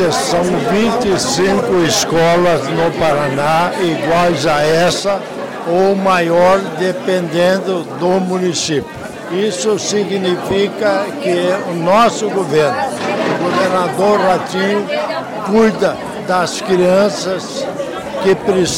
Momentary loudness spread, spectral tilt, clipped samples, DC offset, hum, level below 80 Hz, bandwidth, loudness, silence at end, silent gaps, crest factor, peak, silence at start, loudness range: 7 LU; -4.5 dB/octave; under 0.1%; under 0.1%; none; -46 dBFS; 17 kHz; -14 LUFS; 0 s; none; 10 dB; -4 dBFS; 0 s; 3 LU